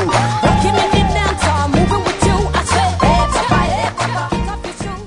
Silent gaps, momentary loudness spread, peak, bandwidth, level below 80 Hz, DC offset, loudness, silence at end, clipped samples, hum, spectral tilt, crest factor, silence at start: none; 6 LU; 0 dBFS; 11 kHz; -24 dBFS; under 0.1%; -15 LUFS; 0 s; under 0.1%; none; -5 dB/octave; 14 dB; 0 s